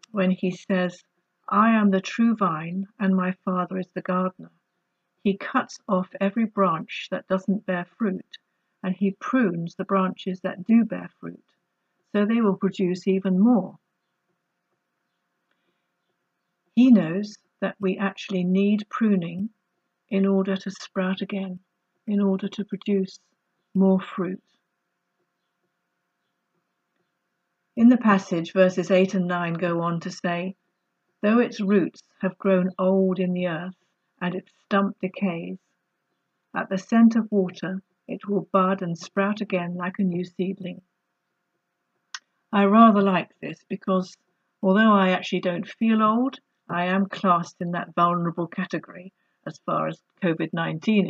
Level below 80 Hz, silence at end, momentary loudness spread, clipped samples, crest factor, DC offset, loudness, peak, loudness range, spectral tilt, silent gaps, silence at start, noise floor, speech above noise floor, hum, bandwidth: -76 dBFS; 0 s; 14 LU; under 0.1%; 22 dB; under 0.1%; -24 LUFS; -2 dBFS; 6 LU; -7.5 dB/octave; none; 0.15 s; -78 dBFS; 55 dB; none; 7.6 kHz